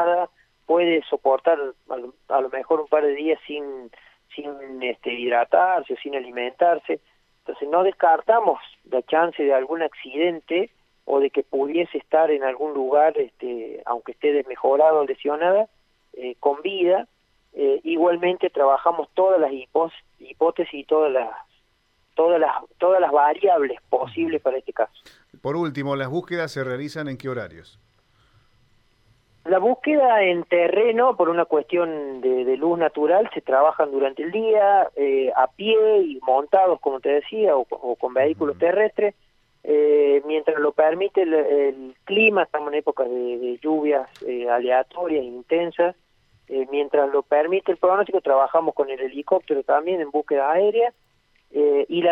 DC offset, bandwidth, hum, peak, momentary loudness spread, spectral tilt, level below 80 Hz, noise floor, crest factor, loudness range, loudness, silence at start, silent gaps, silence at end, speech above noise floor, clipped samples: under 0.1%; 6.4 kHz; none; -4 dBFS; 12 LU; -7 dB/octave; -66 dBFS; -65 dBFS; 18 dB; 5 LU; -21 LUFS; 0 s; none; 0 s; 45 dB; under 0.1%